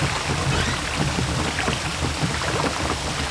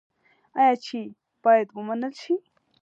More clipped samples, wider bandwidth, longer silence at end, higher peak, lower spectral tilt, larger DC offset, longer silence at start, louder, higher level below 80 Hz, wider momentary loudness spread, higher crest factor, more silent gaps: neither; first, 11 kHz vs 7.8 kHz; second, 0 s vs 0.45 s; about the same, -8 dBFS vs -8 dBFS; second, -4 dB/octave vs -5.5 dB/octave; neither; second, 0 s vs 0.55 s; about the same, -23 LUFS vs -24 LUFS; first, -34 dBFS vs -86 dBFS; second, 2 LU vs 14 LU; about the same, 16 dB vs 18 dB; neither